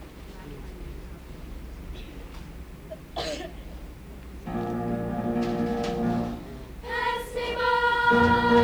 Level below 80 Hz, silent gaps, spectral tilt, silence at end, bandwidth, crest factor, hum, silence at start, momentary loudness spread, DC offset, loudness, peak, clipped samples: -42 dBFS; none; -6 dB/octave; 0 s; over 20 kHz; 20 dB; none; 0 s; 22 LU; under 0.1%; -26 LUFS; -8 dBFS; under 0.1%